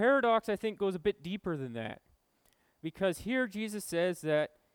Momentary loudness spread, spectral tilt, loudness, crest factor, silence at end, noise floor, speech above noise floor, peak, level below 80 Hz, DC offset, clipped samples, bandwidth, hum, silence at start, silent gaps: 13 LU; -5 dB/octave; -33 LUFS; 16 dB; 0.25 s; -72 dBFS; 40 dB; -16 dBFS; -64 dBFS; under 0.1%; under 0.1%; 19 kHz; none; 0 s; none